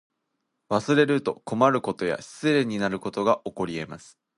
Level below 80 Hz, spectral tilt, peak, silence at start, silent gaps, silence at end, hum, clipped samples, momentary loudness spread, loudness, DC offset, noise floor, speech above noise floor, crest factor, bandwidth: -62 dBFS; -6 dB/octave; -4 dBFS; 0.7 s; none; 0.4 s; none; under 0.1%; 10 LU; -25 LUFS; under 0.1%; -78 dBFS; 54 dB; 22 dB; 11.5 kHz